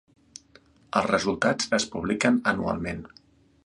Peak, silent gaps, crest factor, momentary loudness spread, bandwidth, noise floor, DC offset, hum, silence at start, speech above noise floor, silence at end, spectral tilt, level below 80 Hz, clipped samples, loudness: -6 dBFS; none; 22 dB; 8 LU; 11 kHz; -57 dBFS; under 0.1%; none; 0.95 s; 32 dB; 0.6 s; -4 dB/octave; -54 dBFS; under 0.1%; -25 LUFS